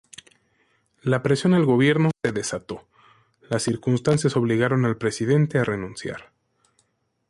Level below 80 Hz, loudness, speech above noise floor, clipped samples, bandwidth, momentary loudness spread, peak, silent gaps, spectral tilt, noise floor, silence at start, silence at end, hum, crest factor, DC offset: -58 dBFS; -22 LUFS; 47 dB; under 0.1%; 11.5 kHz; 14 LU; -6 dBFS; none; -6 dB/octave; -69 dBFS; 1.05 s; 1.05 s; none; 16 dB; under 0.1%